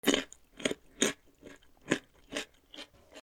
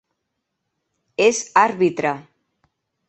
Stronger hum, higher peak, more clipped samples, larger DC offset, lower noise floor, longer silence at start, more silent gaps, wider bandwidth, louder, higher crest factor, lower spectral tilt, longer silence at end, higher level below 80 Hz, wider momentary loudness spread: neither; second, -10 dBFS vs 0 dBFS; neither; neither; second, -55 dBFS vs -77 dBFS; second, 0.05 s vs 1.2 s; neither; first, 17 kHz vs 8.6 kHz; second, -34 LUFS vs -18 LUFS; about the same, 26 dB vs 22 dB; second, -2 dB/octave vs -3.5 dB/octave; second, 0 s vs 0.9 s; about the same, -64 dBFS vs -68 dBFS; first, 23 LU vs 14 LU